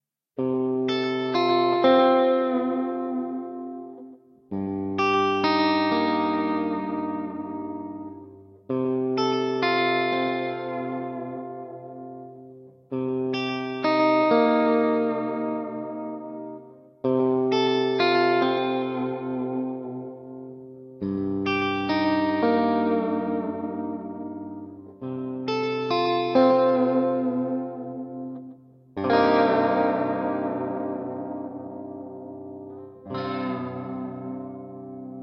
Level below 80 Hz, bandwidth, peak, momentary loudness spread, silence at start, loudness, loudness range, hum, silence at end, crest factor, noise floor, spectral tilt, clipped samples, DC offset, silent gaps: -68 dBFS; 6.6 kHz; -6 dBFS; 19 LU; 0.4 s; -24 LUFS; 7 LU; none; 0 s; 18 dB; -47 dBFS; -6.5 dB/octave; under 0.1%; under 0.1%; none